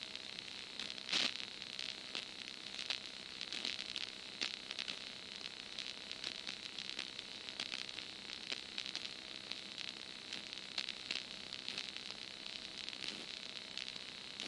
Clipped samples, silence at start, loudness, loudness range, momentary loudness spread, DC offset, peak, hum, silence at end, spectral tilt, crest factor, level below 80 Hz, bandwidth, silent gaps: under 0.1%; 0 s; -43 LUFS; 3 LU; 6 LU; under 0.1%; -20 dBFS; none; 0 s; -0.5 dB/octave; 28 dB; -78 dBFS; 11.5 kHz; none